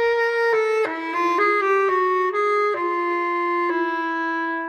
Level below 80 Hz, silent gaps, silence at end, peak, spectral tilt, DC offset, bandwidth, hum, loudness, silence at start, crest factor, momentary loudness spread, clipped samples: -70 dBFS; none; 0 s; -8 dBFS; -3.5 dB/octave; under 0.1%; 14 kHz; none; -21 LUFS; 0 s; 12 dB; 5 LU; under 0.1%